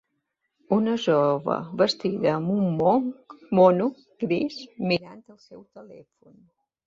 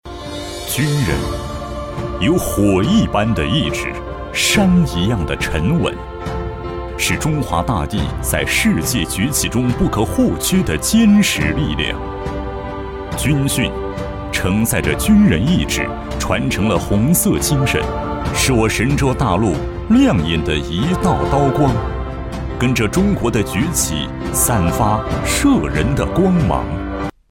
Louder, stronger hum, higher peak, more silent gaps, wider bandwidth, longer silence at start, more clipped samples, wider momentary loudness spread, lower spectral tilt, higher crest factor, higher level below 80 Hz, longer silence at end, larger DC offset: second, -24 LUFS vs -17 LUFS; neither; about the same, -4 dBFS vs -2 dBFS; neither; second, 7.6 kHz vs 17 kHz; first, 0.7 s vs 0.05 s; neither; about the same, 12 LU vs 11 LU; first, -7 dB/octave vs -5 dB/octave; first, 20 dB vs 14 dB; second, -66 dBFS vs -28 dBFS; first, 0.9 s vs 0.2 s; neither